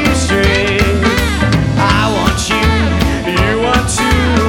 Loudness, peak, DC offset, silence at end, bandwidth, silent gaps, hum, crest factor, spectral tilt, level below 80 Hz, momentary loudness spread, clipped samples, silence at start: -12 LUFS; 0 dBFS; under 0.1%; 0 s; 18 kHz; none; none; 12 dB; -5 dB/octave; -20 dBFS; 2 LU; under 0.1%; 0 s